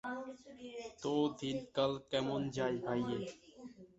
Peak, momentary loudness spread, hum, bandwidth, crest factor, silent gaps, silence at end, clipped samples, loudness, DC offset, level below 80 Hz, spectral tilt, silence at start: -20 dBFS; 16 LU; none; 8 kHz; 18 dB; none; 0.1 s; under 0.1%; -38 LUFS; under 0.1%; -70 dBFS; -4.5 dB/octave; 0.05 s